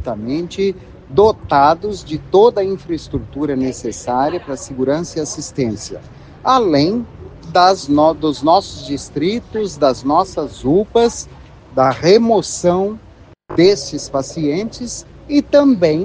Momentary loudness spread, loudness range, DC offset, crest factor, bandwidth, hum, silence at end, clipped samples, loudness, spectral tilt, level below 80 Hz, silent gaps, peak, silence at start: 13 LU; 3 LU; under 0.1%; 16 dB; 9.8 kHz; none; 0 s; under 0.1%; -16 LUFS; -5.5 dB/octave; -42 dBFS; none; 0 dBFS; 0 s